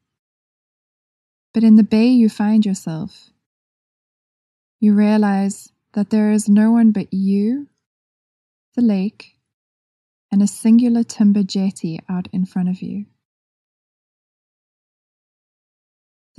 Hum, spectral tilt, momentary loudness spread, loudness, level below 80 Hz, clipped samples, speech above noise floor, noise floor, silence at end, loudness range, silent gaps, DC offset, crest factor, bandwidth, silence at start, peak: none; -7 dB/octave; 14 LU; -16 LUFS; -66 dBFS; under 0.1%; over 74 dB; under -90 dBFS; 3.35 s; 9 LU; 3.46-4.79 s, 7.86-8.72 s, 9.54-10.29 s; under 0.1%; 16 dB; 11.5 kHz; 1.55 s; -2 dBFS